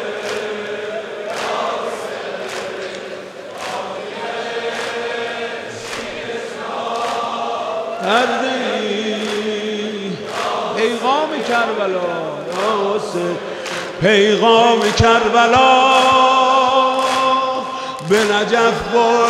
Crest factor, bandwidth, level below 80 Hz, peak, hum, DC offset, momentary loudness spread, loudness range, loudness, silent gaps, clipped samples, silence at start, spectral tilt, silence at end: 16 dB; 14.5 kHz; -48 dBFS; 0 dBFS; none; under 0.1%; 14 LU; 12 LU; -17 LUFS; none; under 0.1%; 0 s; -4 dB/octave; 0 s